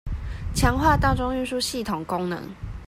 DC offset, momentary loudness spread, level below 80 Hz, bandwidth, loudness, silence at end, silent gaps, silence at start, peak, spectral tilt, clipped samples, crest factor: under 0.1%; 13 LU; -32 dBFS; 16 kHz; -24 LUFS; 0 s; none; 0.05 s; -4 dBFS; -5 dB/octave; under 0.1%; 20 dB